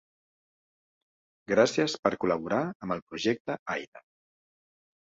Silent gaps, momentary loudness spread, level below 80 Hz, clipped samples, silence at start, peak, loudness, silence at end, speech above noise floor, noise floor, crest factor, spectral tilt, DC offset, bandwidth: 1.99-2.03 s, 2.75-2.80 s, 3.02-3.07 s, 3.40-3.45 s, 3.59-3.66 s, 3.88-3.92 s; 11 LU; -66 dBFS; under 0.1%; 1.5 s; -8 dBFS; -29 LUFS; 1.15 s; over 61 dB; under -90 dBFS; 24 dB; -4.5 dB/octave; under 0.1%; 8 kHz